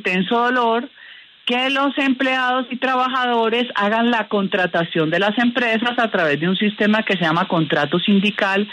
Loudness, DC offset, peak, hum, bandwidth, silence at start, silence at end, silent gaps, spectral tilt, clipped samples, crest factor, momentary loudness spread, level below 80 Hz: -18 LUFS; under 0.1%; -4 dBFS; none; 9.6 kHz; 0.05 s; 0 s; none; -6 dB/octave; under 0.1%; 14 dB; 3 LU; -68 dBFS